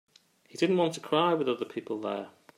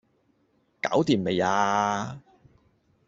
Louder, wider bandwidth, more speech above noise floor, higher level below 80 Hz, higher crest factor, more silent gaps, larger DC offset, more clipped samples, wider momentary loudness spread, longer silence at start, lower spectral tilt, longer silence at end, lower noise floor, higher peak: second, -29 LUFS vs -25 LUFS; first, 14 kHz vs 8 kHz; second, 25 dB vs 44 dB; second, -80 dBFS vs -64 dBFS; about the same, 18 dB vs 20 dB; neither; neither; neither; about the same, 10 LU vs 11 LU; second, 0.55 s vs 0.85 s; about the same, -5.5 dB/octave vs -5 dB/octave; second, 0.3 s vs 0.9 s; second, -54 dBFS vs -68 dBFS; second, -12 dBFS vs -8 dBFS